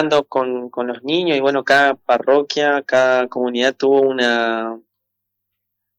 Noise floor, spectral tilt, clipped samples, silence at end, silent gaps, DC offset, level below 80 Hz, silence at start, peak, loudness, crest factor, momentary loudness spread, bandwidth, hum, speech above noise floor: -77 dBFS; -4 dB/octave; under 0.1%; 1.2 s; none; under 0.1%; -70 dBFS; 0 s; -6 dBFS; -17 LUFS; 12 dB; 10 LU; 10 kHz; none; 61 dB